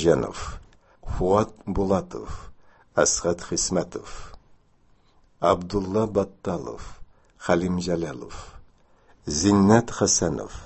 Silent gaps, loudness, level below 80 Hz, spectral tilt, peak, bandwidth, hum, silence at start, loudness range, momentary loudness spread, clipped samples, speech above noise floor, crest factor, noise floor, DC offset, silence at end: none; -23 LUFS; -42 dBFS; -4.5 dB/octave; -2 dBFS; 8.6 kHz; none; 0 s; 5 LU; 20 LU; under 0.1%; 35 dB; 24 dB; -59 dBFS; under 0.1%; 0 s